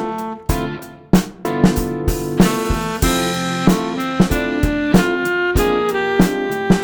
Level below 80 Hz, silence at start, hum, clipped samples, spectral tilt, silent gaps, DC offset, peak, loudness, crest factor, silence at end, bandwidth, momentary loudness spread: -28 dBFS; 0 s; none; under 0.1%; -5.5 dB/octave; none; under 0.1%; 0 dBFS; -18 LUFS; 16 dB; 0 s; over 20 kHz; 7 LU